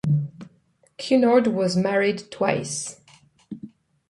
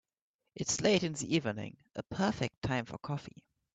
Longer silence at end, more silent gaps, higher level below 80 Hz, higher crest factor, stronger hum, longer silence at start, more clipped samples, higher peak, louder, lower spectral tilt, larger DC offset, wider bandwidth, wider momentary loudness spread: about the same, 0.45 s vs 0.45 s; second, none vs 2.57-2.62 s; about the same, -62 dBFS vs -62 dBFS; about the same, 18 dB vs 20 dB; neither; second, 0.05 s vs 0.55 s; neither; first, -6 dBFS vs -16 dBFS; first, -22 LUFS vs -34 LUFS; about the same, -5.5 dB/octave vs -4.5 dB/octave; neither; first, 11.5 kHz vs 9.4 kHz; first, 22 LU vs 14 LU